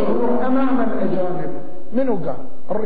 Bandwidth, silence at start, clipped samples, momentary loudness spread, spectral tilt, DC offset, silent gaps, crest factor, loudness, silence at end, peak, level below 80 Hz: 4.9 kHz; 0 s; under 0.1%; 11 LU; -11 dB/octave; 20%; none; 14 dB; -22 LUFS; 0 s; -6 dBFS; -52 dBFS